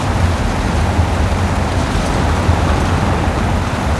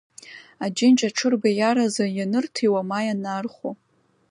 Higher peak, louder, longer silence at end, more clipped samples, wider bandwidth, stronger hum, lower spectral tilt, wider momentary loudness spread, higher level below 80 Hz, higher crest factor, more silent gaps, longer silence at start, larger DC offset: first, -2 dBFS vs -8 dBFS; first, -16 LUFS vs -22 LUFS; second, 0 s vs 0.55 s; neither; about the same, 12 kHz vs 11 kHz; neither; first, -6 dB/octave vs -4.5 dB/octave; second, 2 LU vs 18 LU; first, -22 dBFS vs -74 dBFS; about the same, 14 dB vs 16 dB; neither; second, 0 s vs 0.25 s; neither